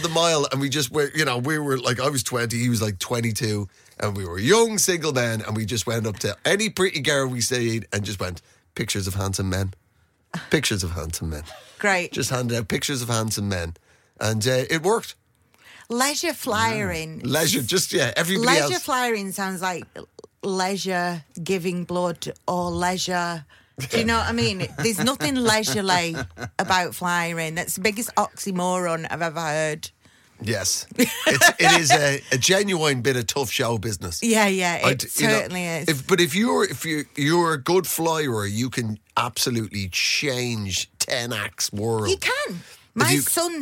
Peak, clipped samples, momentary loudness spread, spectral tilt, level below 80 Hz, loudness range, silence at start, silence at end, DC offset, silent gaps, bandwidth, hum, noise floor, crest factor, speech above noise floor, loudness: -4 dBFS; under 0.1%; 10 LU; -3.5 dB/octave; -50 dBFS; 6 LU; 0 s; 0 s; under 0.1%; none; 17 kHz; none; -63 dBFS; 18 dB; 40 dB; -22 LUFS